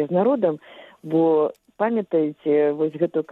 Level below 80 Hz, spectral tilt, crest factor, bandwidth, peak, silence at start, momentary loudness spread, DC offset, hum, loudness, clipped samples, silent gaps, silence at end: -74 dBFS; -9.5 dB/octave; 14 dB; 4.1 kHz; -8 dBFS; 0 s; 7 LU; under 0.1%; none; -22 LUFS; under 0.1%; none; 0 s